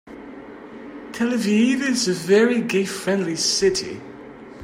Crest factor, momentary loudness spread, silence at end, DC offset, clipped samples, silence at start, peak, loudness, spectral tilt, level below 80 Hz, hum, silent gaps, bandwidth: 16 dB; 22 LU; 0 s; under 0.1%; under 0.1%; 0.05 s; -6 dBFS; -20 LUFS; -4 dB/octave; -56 dBFS; none; none; 16 kHz